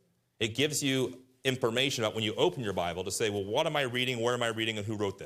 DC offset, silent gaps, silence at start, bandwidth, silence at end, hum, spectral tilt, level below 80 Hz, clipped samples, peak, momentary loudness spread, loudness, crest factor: under 0.1%; none; 0.4 s; 15.5 kHz; 0 s; none; -3.5 dB/octave; -70 dBFS; under 0.1%; -10 dBFS; 5 LU; -30 LUFS; 20 dB